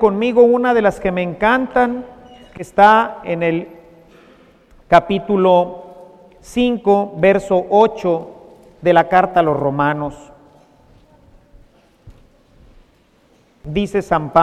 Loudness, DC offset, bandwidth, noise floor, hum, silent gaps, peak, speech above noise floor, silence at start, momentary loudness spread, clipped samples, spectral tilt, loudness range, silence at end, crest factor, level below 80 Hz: -15 LUFS; under 0.1%; 13 kHz; -54 dBFS; none; none; 0 dBFS; 40 dB; 0 s; 12 LU; under 0.1%; -6.5 dB/octave; 10 LU; 0 s; 16 dB; -44 dBFS